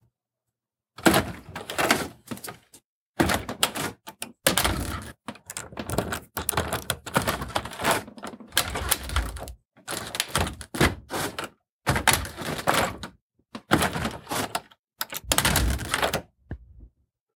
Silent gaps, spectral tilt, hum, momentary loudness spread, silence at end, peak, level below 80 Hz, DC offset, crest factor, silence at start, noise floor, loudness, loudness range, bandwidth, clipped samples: 2.84-3.14 s, 11.70-11.79 s, 13.21-13.30 s, 14.79-14.84 s; -3 dB/octave; none; 18 LU; 0.5 s; -2 dBFS; -40 dBFS; under 0.1%; 28 dB; 1 s; -86 dBFS; -26 LUFS; 2 LU; 19 kHz; under 0.1%